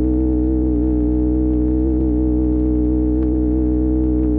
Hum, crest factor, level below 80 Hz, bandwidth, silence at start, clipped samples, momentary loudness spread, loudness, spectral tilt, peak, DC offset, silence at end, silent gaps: none; 10 dB; -20 dBFS; 2 kHz; 0 s; under 0.1%; 0 LU; -18 LUFS; -14.5 dB/octave; -6 dBFS; under 0.1%; 0 s; none